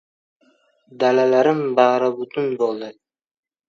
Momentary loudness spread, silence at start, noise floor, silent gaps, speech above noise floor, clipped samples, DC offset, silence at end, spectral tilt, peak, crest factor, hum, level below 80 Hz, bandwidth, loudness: 9 LU; 0.95 s; -61 dBFS; none; 42 dB; under 0.1%; under 0.1%; 0.8 s; -6 dB/octave; 0 dBFS; 20 dB; none; -76 dBFS; 7.2 kHz; -18 LUFS